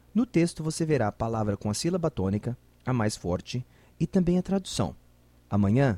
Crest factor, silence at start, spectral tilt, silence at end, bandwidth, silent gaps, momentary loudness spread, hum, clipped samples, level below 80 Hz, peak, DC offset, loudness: 16 dB; 0.15 s; -6.5 dB/octave; 0 s; 13.5 kHz; none; 9 LU; none; under 0.1%; -50 dBFS; -10 dBFS; under 0.1%; -28 LUFS